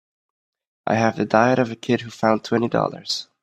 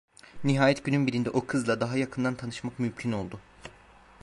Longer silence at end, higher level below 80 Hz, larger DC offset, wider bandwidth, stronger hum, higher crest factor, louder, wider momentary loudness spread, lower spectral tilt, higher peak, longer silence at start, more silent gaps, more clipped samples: first, 0.2 s vs 0 s; about the same, -62 dBFS vs -60 dBFS; neither; about the same, 12.5 kHz vs 11.5 kHz; neither; about the same, 22 dB vs 20 dB; first, -21 LUFS vs -28 LUFS; second, 8 LU vs 19 LU; about the same, -5.5 dB/octave vs -6 dB/octave; first, 0 dBFS vs -10 dBFS; first, 0.85 s vs 0.25 s; neither; neither